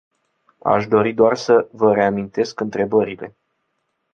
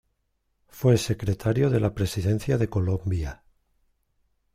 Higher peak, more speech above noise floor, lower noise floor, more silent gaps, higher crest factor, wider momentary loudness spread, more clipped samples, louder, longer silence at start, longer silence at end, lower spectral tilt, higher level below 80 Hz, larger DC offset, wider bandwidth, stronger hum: first, -2 dBFS vs -8 dBFS; first, 55 dB vs 50 dB; about the same, -72 dBFS vs -74 dBFS; neither; about the same, 18 dB vs 18 dB; first, 11 LU vs 6 LU; neither; first, -18 LUFS vs -25 LUFS; about the same, 0.65 s vs 0.75 s; second, 0.85 s vs 1.2 s; about the same, -6.5 dB/octave vs -7 dB/octave; second, -58 dBFS vs -46 dBFS; neither; second, 7.2 kHz vs 16 kHz; neither